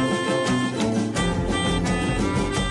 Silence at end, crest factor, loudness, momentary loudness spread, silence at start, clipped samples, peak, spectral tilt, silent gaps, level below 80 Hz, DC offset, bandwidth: 0 s; 12 dB; -23 LUFS; 1 LU; 0 s; under 0.1%; -10 dBFS; -5 dB/octave; none; -34 dBFS; under 0.1%; 11.5 kHz